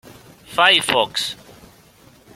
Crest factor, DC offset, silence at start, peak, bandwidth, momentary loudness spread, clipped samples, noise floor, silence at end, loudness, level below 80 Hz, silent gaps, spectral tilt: 22 dB; under 0.1%; 0.05 s; 0 dBFS; 16.5 kHz; 14 LU; under 0.1%; -50 dBFS; 1 s; -17 LUFS; -58 dBFS; none; -1.5 dB/octave